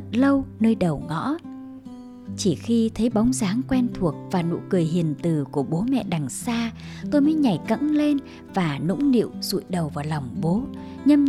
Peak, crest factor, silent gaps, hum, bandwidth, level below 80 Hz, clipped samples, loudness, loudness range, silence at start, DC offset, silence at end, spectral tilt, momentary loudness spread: -6 dBFS; 16 dB; none; none; 14 kHz; -50 dBFS; under 0.1%; -23 LUFS; 2 LU; 0 s; under 0.1%; 0 s; -6.5 dB/octave; 10 LU